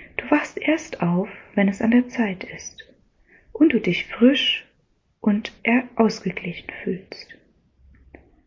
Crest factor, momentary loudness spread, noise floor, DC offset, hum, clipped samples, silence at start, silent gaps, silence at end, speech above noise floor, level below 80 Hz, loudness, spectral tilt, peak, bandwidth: 18 dB; 15 LU; -65 dBFS; under 0.1%; none; under 0.1%; 0 s; none; 1.15 s; 44 dB; -56 dBFS; -22 LUFS; -5.5 dB/octave; -4 dBFS; 7.6 kHz